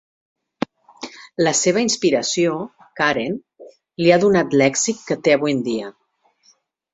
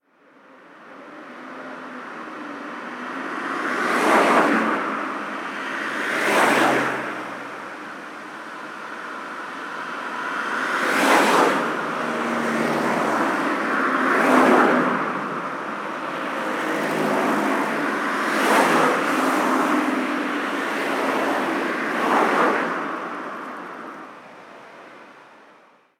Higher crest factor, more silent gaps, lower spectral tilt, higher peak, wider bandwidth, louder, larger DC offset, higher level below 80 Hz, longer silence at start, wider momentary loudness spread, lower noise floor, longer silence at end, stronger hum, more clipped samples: about the same, 18 dB vs 20 dB; neither; about the same, -4 dB/octave vs -4 dB/octave; about the same, -2 dBFS vs -2 dBFS; second, 8.2 kHz vs 18 kHz; about the same, -19 LUFS vs -21 LUFS; neither; first, -60 dBFS vs -70 dBFS; first, 1 s vs 0.55 s; about the same, 18 LU vs 18 LU; first, -59 dBFS vs -53 dBFS; first, 1 s vs 0.7 s; neither; neither